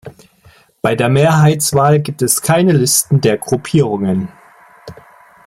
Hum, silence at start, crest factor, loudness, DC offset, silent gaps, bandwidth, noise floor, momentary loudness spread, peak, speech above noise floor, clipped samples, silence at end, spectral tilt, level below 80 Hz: none; 0.05 s; 14 dB; -13 LUFS; under 0.1%; none; 16 kHz; -48 dBFS; 8 LU; 0 dBFS; 35 dB; under 0.1%; 0.55 s; -5 dB/octave; -48 dBFS